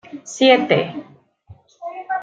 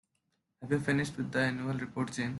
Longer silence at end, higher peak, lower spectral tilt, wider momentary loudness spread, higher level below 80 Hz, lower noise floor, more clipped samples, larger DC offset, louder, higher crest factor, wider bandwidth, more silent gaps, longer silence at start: about the same, 0 s vs 0 s; first, -2 dBFS vs -16 dBFS; second, -4.5 dB/octave vs -6 dB/octave; first, 21 LU vs 6 LU; about the same, -66 dBFS vs -66 dBFS; second, -48 dBFS vs -80 dBFS; neither; neither; first, -17 LUFS vs -33 LUFS; about the same, 18 dB vs 18 dB; second, 9 kHz vs 12 kHz; neither; second, 0.15 s vs 0.6 s